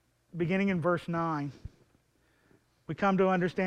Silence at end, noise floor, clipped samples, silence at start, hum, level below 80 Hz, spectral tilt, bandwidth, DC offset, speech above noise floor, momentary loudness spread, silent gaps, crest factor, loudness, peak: 0 s; -69 dBFS; under 0.1%; 0.35 s; none; -60 dBFS; -8 dB/octave; 8.8 kHz; under 0.1%; 40 dB; 22 LU; none; 18 dB; -30 LUFS; -14 dBFS